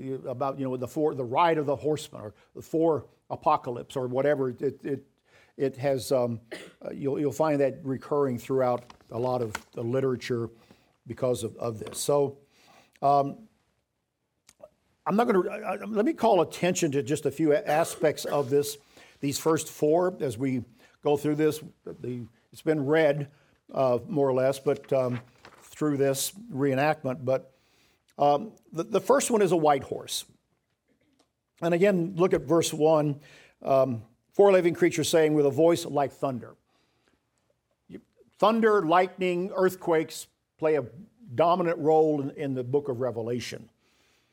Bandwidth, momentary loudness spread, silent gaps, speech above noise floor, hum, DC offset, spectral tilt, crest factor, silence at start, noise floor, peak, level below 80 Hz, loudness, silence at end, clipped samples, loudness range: 19 kHz; 13 LU; none; 53 dB; none; under 0.1%; -5.5 dB/octave; 20 dB; 0 s; -79 dBFS; -8 dBFS; -68 dBFS; -27 LUFS; 0.7 s; under 0.1%; 5 LU